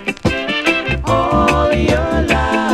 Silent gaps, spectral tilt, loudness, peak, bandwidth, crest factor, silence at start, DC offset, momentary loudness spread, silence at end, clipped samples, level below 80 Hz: none; -5.5 dB/octave; -15 LUFS; 0 dBFS; 14 kHz; 14 dB; 0 s; under 0.1%; 4 LU; 0 s; under 0.1%; -24 dBFS